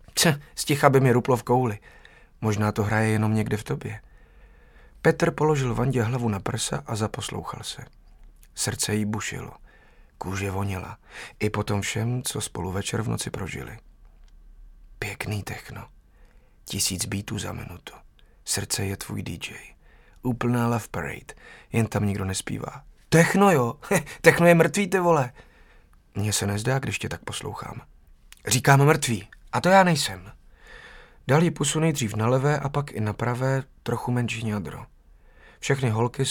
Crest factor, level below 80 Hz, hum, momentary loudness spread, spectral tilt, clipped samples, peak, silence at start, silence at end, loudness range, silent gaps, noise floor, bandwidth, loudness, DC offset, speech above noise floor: 24 dB; -50 dBFS; none; 19 LU; -5 dB/octave; under 0.1%; 0 dBFS; 0.15 s; 0 s; 10 LU; none; -54 dBFS; 18 kHz; -24 LUFS; under 0.1%; 30 dB